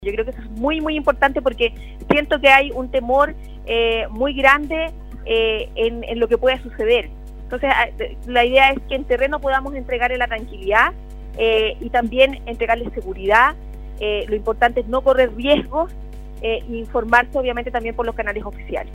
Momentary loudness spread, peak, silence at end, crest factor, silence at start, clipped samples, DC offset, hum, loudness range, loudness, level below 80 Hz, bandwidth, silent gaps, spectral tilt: 13 LU; 0 dBFS; 0 s; 20 dB; 0 s; under 0.1%; under 0.1%; none; 3 LU; -18 LUFS; -32 dBFS; 16 kHz; none; -5.5 dB/octave